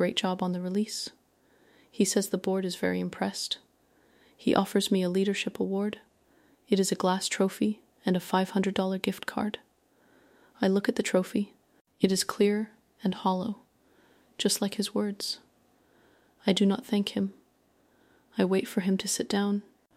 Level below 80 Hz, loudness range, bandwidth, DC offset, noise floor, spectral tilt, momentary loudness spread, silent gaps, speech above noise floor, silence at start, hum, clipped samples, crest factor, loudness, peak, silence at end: -70 dBFS; 3 LU; 16 kHz; under 0.1%; -67 dBFS; -4.5 dB/octave; 8 LU; 11.81-11.85 s; 39 dB; 0 s; none; under 0.1%; 22 dB; -29 LUFS; -8 dBFS; 0.35 s